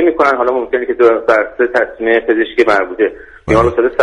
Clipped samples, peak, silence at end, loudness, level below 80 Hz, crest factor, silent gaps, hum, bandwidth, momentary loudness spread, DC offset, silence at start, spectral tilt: under 0.1%; 0 dBFS; 0 s; -13 LUFS; -36 dBFS; 12 dB; none; none; 10 kHz; 6 LU; under 0.1%; 0 s; -6.5 dB/octave